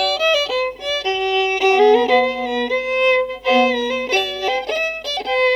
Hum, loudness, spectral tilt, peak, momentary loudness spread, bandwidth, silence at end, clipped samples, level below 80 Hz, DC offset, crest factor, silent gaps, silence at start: 50 Hz at -50 dBFS; -17 LUFS; -2 dB/octave; -4 dBFS; 8 LU; 13.5 kHz; 0 s; under 0.1%; -52 dBFS; under 0.1%; 14 dB; none; 0 s